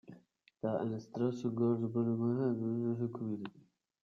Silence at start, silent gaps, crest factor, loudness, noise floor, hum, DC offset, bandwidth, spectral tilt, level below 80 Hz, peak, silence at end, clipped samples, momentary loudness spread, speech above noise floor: 0.1 s; none; 16 dB; -36 LUFS; -64 dBFS; none; under 0.1%; 7 kHz; -9.5 dB/octave; -78 dBFS; -20 dBFS; 0.45 s; under 0.1%; 8 LU; 29 dB